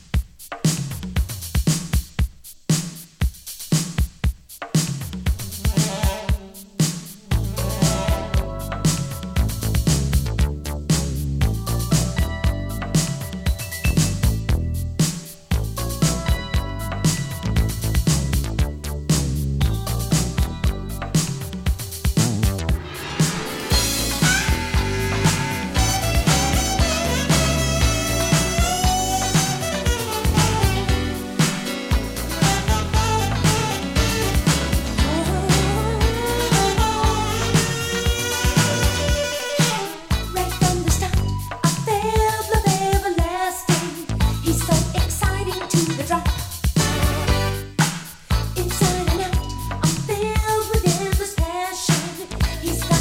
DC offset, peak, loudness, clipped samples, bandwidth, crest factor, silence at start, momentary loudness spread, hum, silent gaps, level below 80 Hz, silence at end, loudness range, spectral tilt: under 0.1%; -2 dBFS; -21 LUFS; under 0.1%; 17 kHz; 18 dB; 0.15 s; 7 LU; none; none; -26 dBFS; 0 s; 4 LU; -4.5 dB/octave